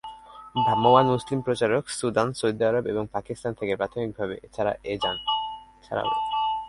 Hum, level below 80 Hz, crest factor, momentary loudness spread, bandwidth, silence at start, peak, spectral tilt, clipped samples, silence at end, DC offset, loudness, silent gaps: none; -56 dBFS; 22 dB; 13 LU; 11.5 kHz; 0.05 s; -4 dBFS; -5 dB/octave; under 0.1%; 0 s; under 0.1%; -25 LUFS; none